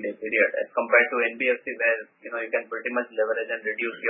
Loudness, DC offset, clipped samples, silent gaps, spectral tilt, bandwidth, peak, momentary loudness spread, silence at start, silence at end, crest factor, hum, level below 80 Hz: -24 LUFS; under 0.1%; under 0.1%; none; -7.5 dB/octave; 3.7 kHz; -4 dBFS; 9 LU; 0 s; 0 s; 20 dB; none; -82 dBFS